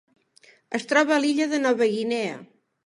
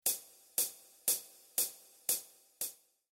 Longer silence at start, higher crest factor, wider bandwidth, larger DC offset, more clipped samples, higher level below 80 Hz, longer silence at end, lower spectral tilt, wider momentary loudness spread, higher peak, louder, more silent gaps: first, 0.7 s vs 0.05 s; second, 18 dB vs 24 dB; second, 11.5 kHz vs 17.5 kHz; neither; neither; first, -80 dBFS vs -86 dBFS; about the same, 0.4 s vs 0.4 s; first, -4 dB/octave vs 1.5 dB/octave; first, 12 LU vs 8 LU; first, -6 dBFS vs -16 dBFS; first, -23 LUFS vs -36 LUFS; neither